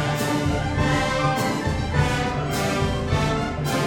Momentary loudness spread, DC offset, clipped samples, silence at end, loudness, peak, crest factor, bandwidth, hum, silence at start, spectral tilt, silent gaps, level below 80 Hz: 3 LU; under 0.1%; under 0.1%; 0 s; -23 LUFS; -8 dBFS; 14 dB; 17.5 kHz; none; 0 s; -5.5 dB/octave; none; -34 dBFS